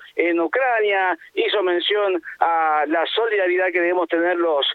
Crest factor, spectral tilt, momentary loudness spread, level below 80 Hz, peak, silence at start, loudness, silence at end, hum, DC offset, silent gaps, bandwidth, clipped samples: 16 dB; -4.5 dB/octave; 3 LU; -74 dBFS; -4 dBFS; 0 s; -20 LUFS; 0 s; none; under 0.1%; none; 4.5 kHz; under 0.1%